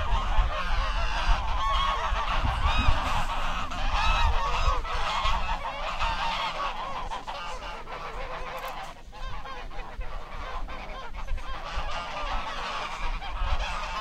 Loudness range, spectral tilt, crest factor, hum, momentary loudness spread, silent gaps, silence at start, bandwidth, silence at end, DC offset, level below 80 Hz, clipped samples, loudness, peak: 11 LU; -4 dB/octave; 20 dB; none; 13 LU; none; 0 s; 9.2 kHz; 0 s; under 0.1%; -30 dBFS; under 0.1%; -31 LUFS; -8 dBFS